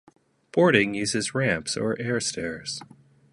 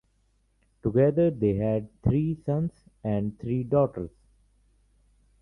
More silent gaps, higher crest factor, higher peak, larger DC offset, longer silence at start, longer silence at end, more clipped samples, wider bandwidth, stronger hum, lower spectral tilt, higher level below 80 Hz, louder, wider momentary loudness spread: neither; about the same, 22 dB vs 18 dB; first, -4 dBFS vs -10 dBFS; neither; second, 0.55 s vs 0.85 s; second, 0.5 s vs 1.35 s; neither; first, 11.5 kHz vs 3.8 kHz; second, none vs 50 Hz at -50 dBFS; second, -4 dB/octave vs -11.5 dB/octave; second, -58 dBFS vs -50 dBFS; about the same, -25 LUFS vs -27 LUFS; about the same, 13 LU vs 11 LU